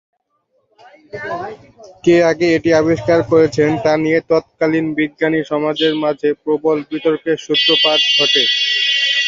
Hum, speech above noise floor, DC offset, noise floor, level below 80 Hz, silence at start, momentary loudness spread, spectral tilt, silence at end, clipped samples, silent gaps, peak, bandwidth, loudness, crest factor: none; 49 dB; under 0.1%; -65 dBFS; -52 dBFS; 1.15 s; 9 LU; -4.5 dB/octave; 0 s; under 0.1%; none; 0 dBFS; 7.6 kHz; -14 LUFS; 14 dB